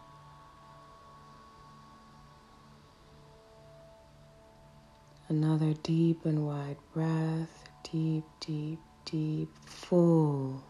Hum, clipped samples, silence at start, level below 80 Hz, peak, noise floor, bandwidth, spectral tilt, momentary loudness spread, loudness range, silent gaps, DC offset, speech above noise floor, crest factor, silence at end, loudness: none; under 0.1%; 0.1 s; -66 dBFS; -14 dBFS; -57 dBFS; 11 kHz; -8.5 dB/octave; 27 LU; 6 LU; none; under 0.1%; 27 dB; 20 dB; 0.05 s; -32 LUFS